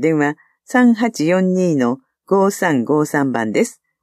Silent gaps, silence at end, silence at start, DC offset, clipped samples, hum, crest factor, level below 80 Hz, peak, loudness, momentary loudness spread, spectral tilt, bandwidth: none; 0.3 s; 0 s; under 0.1%; under 0.1%; none; 14 dB; -70 dBFS; -2 dBFS; -17 LUFS; 7 LU; -6 dB/octave; 14.5 kHz